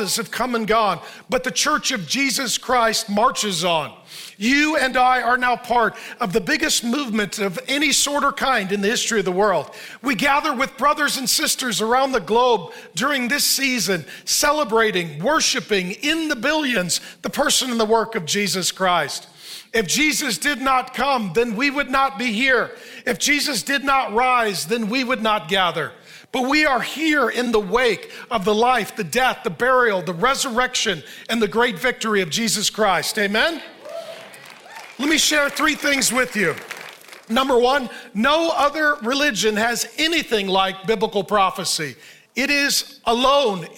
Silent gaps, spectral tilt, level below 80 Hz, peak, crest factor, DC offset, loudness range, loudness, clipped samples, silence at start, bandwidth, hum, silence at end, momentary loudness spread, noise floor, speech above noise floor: none; -2.5 dB/octave; -50 dBFS; -4 dBFS; 16 dB; under 0.1%; 1 LU; -19 LUFS; under 0.1%; 0 s; 17 kHz; none; 0 s; 8 LU; -41 dBFS; 21 dB